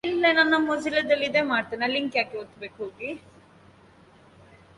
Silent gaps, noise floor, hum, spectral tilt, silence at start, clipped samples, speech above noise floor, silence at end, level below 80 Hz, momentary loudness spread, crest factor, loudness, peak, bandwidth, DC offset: none; -54 dBFS; none; -4 dB/octave; 0.05 s; under 0.1%; 29 dB; 1.6 s; -64 dBFS; 17 LU; 18 dB; -24 LUFS; -8 dBFS; 11.5 kHz; under 0.1%